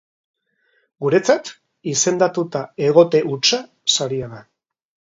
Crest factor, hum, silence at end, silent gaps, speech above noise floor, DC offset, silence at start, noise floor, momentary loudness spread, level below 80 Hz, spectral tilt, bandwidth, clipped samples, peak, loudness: 20 dB; none; 0.65 s; none; 47 dB; under 0.1%; 1 s; -65 dBFS; 12 LU; -62 dBFS; -3.5 dB/octave; 8 kHz; under 0.1%; 0 dBFS; -18 LUFS